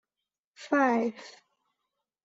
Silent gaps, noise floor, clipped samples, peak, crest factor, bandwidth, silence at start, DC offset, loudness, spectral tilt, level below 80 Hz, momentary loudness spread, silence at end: none; -89 dBFS; under 0.1%; -12 dBFS; 20 dB; 8 kHz; 0.6 s; under 0.1%; -27 LUFS; -5 dB/octave; -80 dBFS; 24 LU; 0.95 s